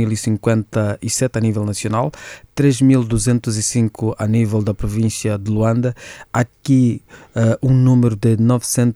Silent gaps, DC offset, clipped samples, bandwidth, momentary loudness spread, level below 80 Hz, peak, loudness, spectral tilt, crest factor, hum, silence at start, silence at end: none; under 0.1%; under 0.1%; 14 kHz; 7 LU; -40 dBFS; -4 dBFS; -17 LUFS; -6 dB/octave; 14 dB; none; 0 s; 0 s